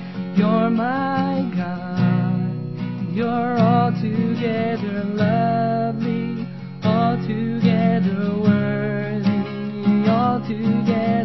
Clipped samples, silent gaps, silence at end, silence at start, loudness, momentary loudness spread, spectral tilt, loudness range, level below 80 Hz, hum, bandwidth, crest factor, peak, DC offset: under 0.1%; none; 0 s; 0 s; -20 LUFS; 7 LU; -9.5 dB/octave; 2 LU; -56 dBFS; none; 6 kHz; 16 dB; -4 dBFS; 0.4%